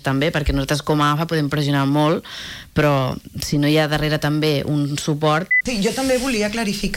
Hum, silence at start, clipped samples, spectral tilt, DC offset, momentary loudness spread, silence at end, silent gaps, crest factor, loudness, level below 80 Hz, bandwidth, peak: none; 0.05 s; under 0.1%; -5.5 dB/octave; under 0.1%; 6 LU; 0 s; none; 14 dB; -19 LUFS; -36 dBFS; 16.5 kHz; -6 dBFS